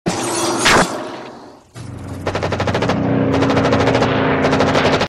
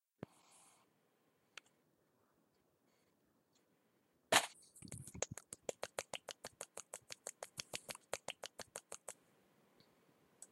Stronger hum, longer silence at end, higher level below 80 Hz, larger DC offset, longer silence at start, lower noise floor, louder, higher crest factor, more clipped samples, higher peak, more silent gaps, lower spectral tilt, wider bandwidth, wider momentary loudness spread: neither; about the same, 0 s vs 0.05 s; first, -40 dBFS vs -80 dBFS; neither; second, 0.05 s vs 0.55 s; second, -37 dBFS vs -79 dBFS; first, -16 LUFS vs -44 LUFS; second, 14 dB vs 36 dB; neither; first, -2 dBFS vs -14 dBFS; neither; first, -4.5 dB/octave vs -1 dB/octave; second, 14.5 kHz vs 16 kHz; second, 18 LU vs 24 LU